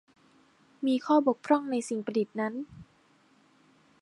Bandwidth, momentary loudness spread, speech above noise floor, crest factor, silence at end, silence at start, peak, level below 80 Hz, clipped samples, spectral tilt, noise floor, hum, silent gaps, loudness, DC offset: 11.5 kHz; 9 LU; 36 dB; 20 dB; 1.2 s; 0.8 s; -10 dBFS; -72 dBFS; under 0.1%; -5.5 dB/octave; -64 dBFS; none; none; -29 LUFS; under 0.1%